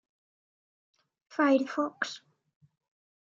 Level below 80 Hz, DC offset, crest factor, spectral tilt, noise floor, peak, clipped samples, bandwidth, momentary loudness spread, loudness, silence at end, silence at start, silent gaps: -90 dBFS; under 0.1%; 20 dB; -3.5 dB/octave; under -90 dBFS; -12 dBFS; under 0.1%; 7.6 kHz; 14 LU; -29 LUFS; 1.1 s; 1.3 s; none